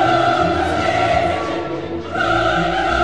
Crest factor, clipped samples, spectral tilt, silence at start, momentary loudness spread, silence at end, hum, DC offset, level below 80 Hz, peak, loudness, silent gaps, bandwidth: 14 dB; under 0.1%; -5.5 dB/octave; 0 s; 8 LU; 0 s; none; 0.8%; -36 dBFS; -4 dBFS; -18 LUFS; none; 11 kHz